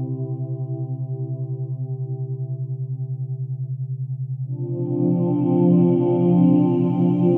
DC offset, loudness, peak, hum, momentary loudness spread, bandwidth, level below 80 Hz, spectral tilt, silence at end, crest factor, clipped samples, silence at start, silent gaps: under 0.1%; -22 LUFS; -6 dBFS; none; 12 LU; 3.3 kHz; -68 dBFS; -13.5 dB/octave; 0 s; 16 dB; under 0.1%; 0 s; none